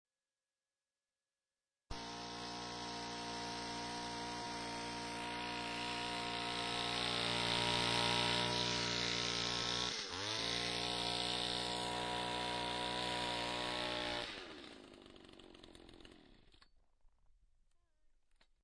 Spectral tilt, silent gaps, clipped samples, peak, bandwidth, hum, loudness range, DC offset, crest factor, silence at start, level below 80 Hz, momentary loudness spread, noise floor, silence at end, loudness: -2.5 dB/octave; none; under 0.1%; -20 dBFS; 10.5 kHz; none; 11 LU; under 0.1%; 22 dB; 1.9 s; -62 dBFS; 18 LU; under -90 dBFS; 2.2 s; -38 LUFS